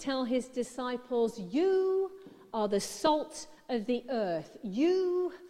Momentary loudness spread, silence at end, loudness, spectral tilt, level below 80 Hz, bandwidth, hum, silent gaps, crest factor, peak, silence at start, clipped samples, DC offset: 11 LU; 0 s; -32 LUFS; -4.5 dB/octave; -66 dBFS; 14 kHz; none; none; 18 dB; -14 dBFS; 0 s; under 0.1%; under 0.1%